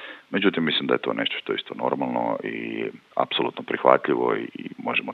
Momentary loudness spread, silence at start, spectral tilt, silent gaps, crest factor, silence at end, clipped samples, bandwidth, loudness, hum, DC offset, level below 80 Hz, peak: 10 LU; 0 s; -7 dB/octave; none; 24 dB; 0 s; under 0.1%; 6 kHz; -24 LUFS; none; under 0.1%; -80 dBFS; 0 dBFS